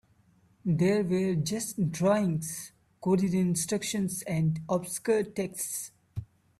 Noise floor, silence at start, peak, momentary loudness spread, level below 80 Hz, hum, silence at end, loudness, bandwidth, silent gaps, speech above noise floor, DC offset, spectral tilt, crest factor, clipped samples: -64 dBFS; 0.65 s; -14 dBFS; 12 LU; -62 dBFS; none; 0.35 s; -29 LUFS; 14.5 kHz; none; 36 dB; under 0.1%; -5.5 dB/octave; 16 dB; under 0.1%